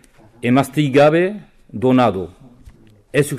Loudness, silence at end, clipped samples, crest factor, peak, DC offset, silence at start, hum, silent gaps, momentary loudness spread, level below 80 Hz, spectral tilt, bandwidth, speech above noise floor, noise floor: -16 LUFS; 0 s; under 0.1%; 12 dB; -4 dBFS; under 0.1%; 0.45 s; none; none; 19 LU; -50 dBFS; -6.5 dB/octave; 15.5 kHz; 30 dB; -45 dBFS